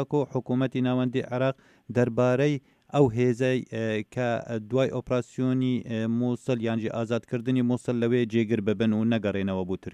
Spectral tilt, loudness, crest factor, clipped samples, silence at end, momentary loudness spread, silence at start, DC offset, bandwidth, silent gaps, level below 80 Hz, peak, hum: -7.5 dB/octave; -27 LUFS; 18 dB; under 0.1%; 0 s; 6 LU; 0 s; under 0.1%; 10 kHz; none; -62 dBFS; -8 dBFS; none